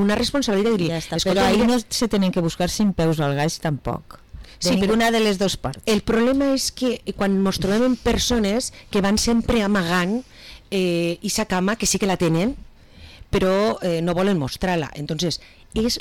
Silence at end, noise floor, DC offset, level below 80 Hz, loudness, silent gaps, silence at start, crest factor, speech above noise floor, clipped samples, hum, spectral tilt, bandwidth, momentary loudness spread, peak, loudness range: 0 s; -44 dBFS; 0.4%; -40 dBFS; -21 LUFS; none; 0 s; 8 dB; 24 dB; under 0.1%; none; -4.5 dB/octave; 18.5 kHz; 7 LU; -12 dBFS; 2 LU